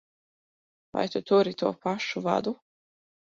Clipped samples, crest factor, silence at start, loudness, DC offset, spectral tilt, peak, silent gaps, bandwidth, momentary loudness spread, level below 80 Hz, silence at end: under 0.1%; 20 dB; 0.95 s; -28 LUFS; under 0.1%; -5.5 dB/octave; -10 dBFS; none; 7.6 kHz; 12 LU; -70 dBFS; 0.65 s